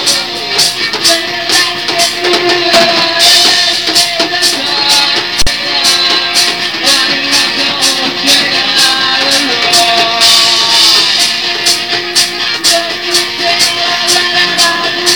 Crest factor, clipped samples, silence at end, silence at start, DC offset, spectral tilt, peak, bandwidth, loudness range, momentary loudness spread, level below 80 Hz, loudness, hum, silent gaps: 10 dB; 0.5%; 0 s; 0 s; 0.8%; 0 dB/octave; 0 dBFS; over 20 kHz; 2 LU; 6 LU; -38 dBFS; -7 LUFS; none; none